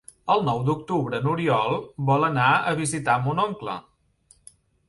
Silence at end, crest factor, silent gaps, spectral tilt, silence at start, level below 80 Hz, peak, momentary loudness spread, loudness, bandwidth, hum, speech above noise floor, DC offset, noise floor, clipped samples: 1.1 s; 18 dB; none; -5.5 dB/octave; 0.25 s; -58 dBFS; -6 dBFS; 7 LU; -23 LUFS; 11.5 kHz; none; 37 dB; under 0.1%; -60 dBFS; under 0.1%